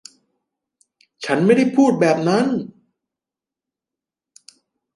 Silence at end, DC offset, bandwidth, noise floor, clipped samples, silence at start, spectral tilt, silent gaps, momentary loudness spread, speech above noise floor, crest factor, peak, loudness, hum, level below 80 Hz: 2.3 s; under 0.1%; 11.5 kHz; -88 dBFS; under 0.1%; 1.2 s; -6.5 dB/octave; none; 13 LU; 72 dB; 18 dB; -2 dBFS; -17 LUFS; none; -68 dBFS